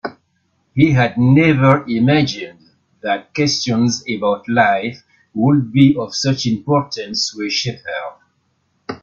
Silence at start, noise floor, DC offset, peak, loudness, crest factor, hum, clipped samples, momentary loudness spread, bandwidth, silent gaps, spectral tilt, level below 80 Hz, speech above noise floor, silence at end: 0.05 s; -64 dBFS; under 0.1%; 0 dBFS; -16 LUFS; 16 dB; none; under 0.1%; 15 LU; 7.6 kHz; none; -5.5 dB/octave; -52 dBFS; 49 dB; 0.05 s